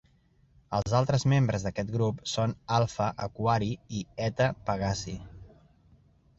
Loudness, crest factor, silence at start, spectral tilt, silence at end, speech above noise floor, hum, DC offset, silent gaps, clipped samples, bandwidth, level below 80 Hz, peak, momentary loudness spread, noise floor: -29 LUFS; 18 dB; 0.7 s; -6 dB/octave; 0.9 s; 36 dB; none; under 0.1%; none; under 0.1%; 8 kHz; -52 dBFS; -12 dBFS; 10 LU; -64 dBFS